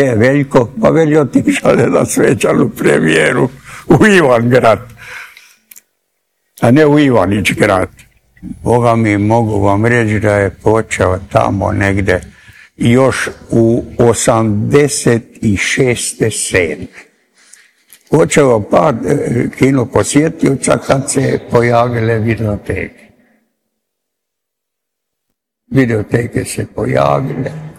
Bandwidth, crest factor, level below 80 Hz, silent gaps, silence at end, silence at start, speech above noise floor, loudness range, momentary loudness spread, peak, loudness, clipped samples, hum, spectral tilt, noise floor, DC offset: 16 kHz; 12 dB; -38 dBFS; none; 0.05 s; 0 s; 66 dB; 7 LU; 9 LU; 0 dBFS; -12 LUFS; 1%; none; -5.5 dB/octave; -77 dBFS; under 0.1%